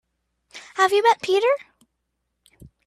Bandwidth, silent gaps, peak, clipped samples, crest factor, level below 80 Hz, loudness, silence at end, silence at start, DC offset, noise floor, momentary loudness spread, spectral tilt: 14.5 kHz; none; -4 dBFS; under 0.1%; 20 dB; -66 dBFS; -20 LUFS; 1.25 s; 0.55 s; under 0.1%; -77 dBFS; 15 LU; -2.5 dB/octave